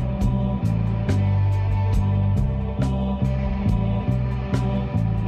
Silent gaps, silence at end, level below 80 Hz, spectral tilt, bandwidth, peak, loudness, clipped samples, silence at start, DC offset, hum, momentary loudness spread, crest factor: none; 0 s; -28 dBFS; -9 dB/octave; 9 kHz; -10 dBFS; -23 LUFS; under 0.1%; 0 s; under 0.1%; none; 3 LU; 12 dB